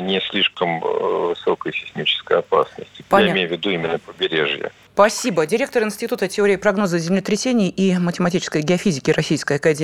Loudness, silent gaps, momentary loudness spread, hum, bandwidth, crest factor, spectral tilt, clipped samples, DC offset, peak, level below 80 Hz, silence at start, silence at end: -19 LUFS; none; 6 LU; none; 15.5 kHz; 18 dB; -4.5 dB/octave; under 0.1%; under 0.1%; 0 dBFS; -56 dBFS; 0 s; 0 s